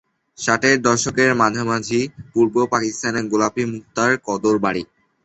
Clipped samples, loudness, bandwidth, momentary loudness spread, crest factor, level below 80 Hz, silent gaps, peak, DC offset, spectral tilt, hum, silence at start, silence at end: under 0.1%; -19 LUFS; 8.2 kHz; 9 LU; 18 dB; -54 dBFS; none; -2 dBFS; under 0.1%; -4 dB/octave; none; 0.4 s; 0.4 s